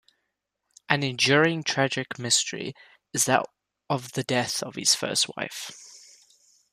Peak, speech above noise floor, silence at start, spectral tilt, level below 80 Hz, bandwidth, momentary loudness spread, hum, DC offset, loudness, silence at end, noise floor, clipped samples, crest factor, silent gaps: -2 dBFS; 54 dB; 0.9 s; -2.5 dB/octave; -70 dBFS; 15.5 kHz; 15 LU; none; under 0.1%; -24 LUFS; 0.75 s; -80 dBFS; under 0.1%; 26 dB; none